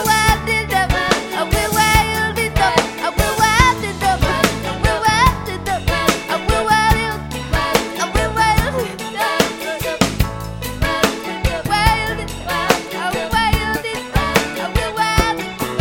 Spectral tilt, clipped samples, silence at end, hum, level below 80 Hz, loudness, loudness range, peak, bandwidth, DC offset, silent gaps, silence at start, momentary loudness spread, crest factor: -4 dB/octave; under 0.1%; 0 s; none; -26 dBFS; -17 LUFS; 3 LU; 0 dBFS; 17 kHz; under 0.1%; none; 0 s; 8 LU; 18 dB